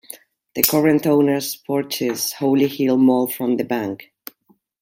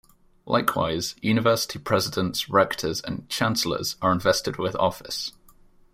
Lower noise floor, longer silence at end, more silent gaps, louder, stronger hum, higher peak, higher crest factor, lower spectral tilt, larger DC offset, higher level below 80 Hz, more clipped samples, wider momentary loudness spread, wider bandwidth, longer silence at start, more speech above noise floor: first, -61 dBFS vs -54 dBFS; first, 0.8 s vs 0.65 s; neither; first, -19 LUFS vs -24 LUFS; neither; first, 0 dBFS vs -6 dBFS; about the same, 20 dB vs 20 dB; about the same, -4.5 dB/octave vs -4 dB/octave; neither; second, -64 dBFS vs -54 dBFS; neither; first, 22 LU vs 9 LU; about the same, 16.5 kHz vs 16 kHz; second, 0.1 s vs 0.45 s; first, 42 dB vs 29 dB